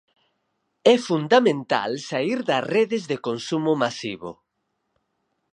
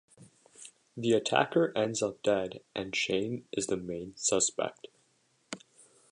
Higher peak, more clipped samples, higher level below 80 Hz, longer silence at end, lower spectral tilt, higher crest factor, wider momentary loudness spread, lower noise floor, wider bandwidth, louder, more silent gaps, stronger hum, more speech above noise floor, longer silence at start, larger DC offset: first, -2 dBFS vs -10 dBFS; neither; about the same, -72 dBFS vs -68 dBFS; first, 1.2 s vs 0.55 s; first, -5 dB/octave vs -3 dB/octave; about the same, 22 dB vs 24 dB; second, 10 LU vs 18 LU; first, -76 dBFS vs -71 dBFS; about the same, 10.5 kHz vs 11 kHz; first, -22 LUFS vs -31 LUFS; neither; neither; first, 54 dB vs 40 dB; first, 0.85 s vs 0.2 s; neither